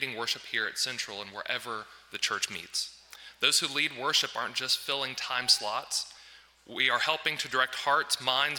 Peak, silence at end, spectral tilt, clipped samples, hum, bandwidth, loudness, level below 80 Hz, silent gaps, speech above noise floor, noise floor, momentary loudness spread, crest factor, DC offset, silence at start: -10 dBFS; 0 s; 0 dB/octave; under 0.1%; none; 18 kHz; -28 LUFS; -74 dBFS; none; 24 dB; -55 dBFS; 13 LU; 22 dB; under 0.1%; 0 s